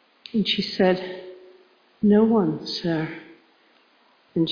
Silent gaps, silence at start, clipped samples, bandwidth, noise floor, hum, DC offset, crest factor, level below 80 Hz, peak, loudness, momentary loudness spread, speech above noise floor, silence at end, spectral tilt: none; 0.35 s; under 0.1%; 5.2 kHz; -60 dBFS; none; under 0.1%; 18 dB; -60 dBFS; -6 dBFS; -23 LUFS; 18 LU; 38 dB; 0 s; -7 dB/octave